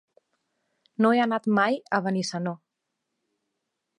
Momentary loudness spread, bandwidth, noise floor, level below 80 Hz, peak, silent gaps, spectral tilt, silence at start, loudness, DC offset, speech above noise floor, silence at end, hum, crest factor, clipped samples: 13 LU; 10.5 kHz; -82 dBFS; -76 dBFS; -8 dBFS; none; -5.5 dB/octave; 1 s; -25 LUFS; under 0.1%; 58 dB; 1.4 s; none; 20 dB; under 0.1%